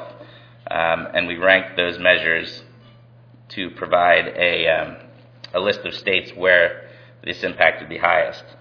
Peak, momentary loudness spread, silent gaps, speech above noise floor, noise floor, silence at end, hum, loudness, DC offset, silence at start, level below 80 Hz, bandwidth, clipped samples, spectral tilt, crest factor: 0 dBFS; 16 LU; none; 28 dB; -48 dBFS; 0.2 s; none; -18 LUFS; under 0.1%; 0 s; -56 dBFS; 5.4 kHz; under 0.1%; -5 dB/octave; 20 dB